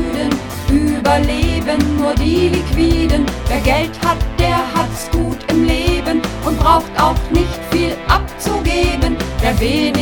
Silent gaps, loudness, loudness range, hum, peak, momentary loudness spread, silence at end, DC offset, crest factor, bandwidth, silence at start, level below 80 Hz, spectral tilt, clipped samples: none; -16 LUFS; 1 LU; none; 0 dBFS; 5 LU; 0 s; under 0.1%; 14 dB; 19 kHz; 0 s; -22 dBFS; -5.5 dB/octave; under 0.1%